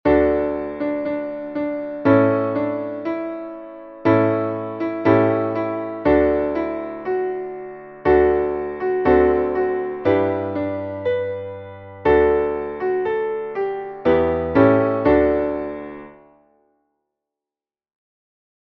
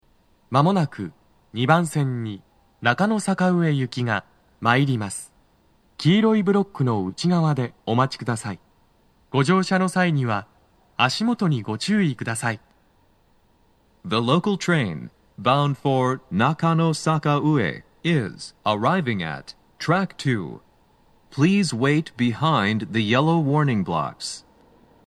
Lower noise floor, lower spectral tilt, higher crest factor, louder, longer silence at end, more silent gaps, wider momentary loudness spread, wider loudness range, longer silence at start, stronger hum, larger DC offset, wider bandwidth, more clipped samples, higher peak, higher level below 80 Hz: first, under -90 dBFS vs -60 dBFS; first, -10 dB/octave vs -6 dB/octave; about the same, 18 dB vs 22 dB; about the same, -20 LUFS vs -22 LUFS; first, 2.55 s vs 0.65 s; neither; about the same, 13 LU vs 11 LU; about the same, 3 LU vs 3 LU; second, 0.05 s vs 0.5 s; neither; neither; second, 5.8 kHz vs 12.5 kHz; neither; about the same, -2 dBFS vs -2 dBFS; first, -42 dBFS vs -62 dBFS